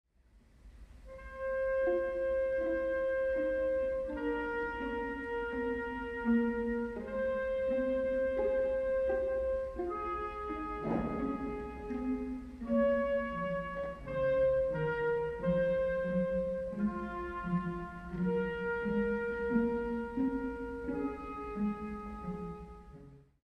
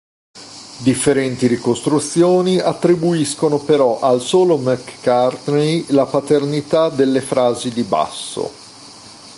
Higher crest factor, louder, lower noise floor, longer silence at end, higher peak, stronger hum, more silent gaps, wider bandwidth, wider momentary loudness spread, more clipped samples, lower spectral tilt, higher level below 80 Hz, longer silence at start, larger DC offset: about the same, 16 dB vs 14 dB; second, -34 LUFS vs -16 LUFS; first, -64 dBFS vs -39 dBFS; first, 0.25 s vs 0 s; second, -20 dBFS vs -2 dBFS; neither; neither; second, 5.8 kHz vs 11.5 kHz; second, 10 LU vs 13 LU; neither; first, -8.5 dB/octave vs -5.5 dB/octave; about the same, -52 dBFS vs -56 dBFS; about the same, 0.35 s vs 0.35 s; neither